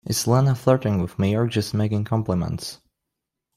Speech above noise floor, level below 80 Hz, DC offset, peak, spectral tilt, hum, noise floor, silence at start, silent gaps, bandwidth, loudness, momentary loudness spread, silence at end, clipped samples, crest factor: 62 dB; -52 dBFS; under 0.1%; -4 dBFS; -6 dB/octave; none; -83 dBFS; 0.05 s; none; 15.5 kHz; -22 LUFS; 8 LU; 0.8 s; under 0.1%; 18 dB